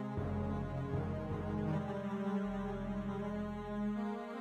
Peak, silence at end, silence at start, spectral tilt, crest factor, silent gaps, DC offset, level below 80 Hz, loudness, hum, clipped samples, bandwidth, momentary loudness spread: -26 dBFS; 0 s; 0 s; -9 dB/octave; 12 dB; none; under 0.1%; -54 dBFS; -39 LUFS; none; under 0.1%; 8.6 kHz; 3 LU